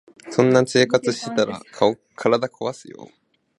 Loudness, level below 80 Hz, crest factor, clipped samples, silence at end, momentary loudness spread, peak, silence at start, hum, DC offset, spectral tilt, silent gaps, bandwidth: -21 LUFS; -64 dBFS; 20 dB; under 0.1%; 0.55 s; 11 LU; -2 dBFS; 0.25 s; none; under 0.1%; -5 dB/octave; none; 11.5 kHz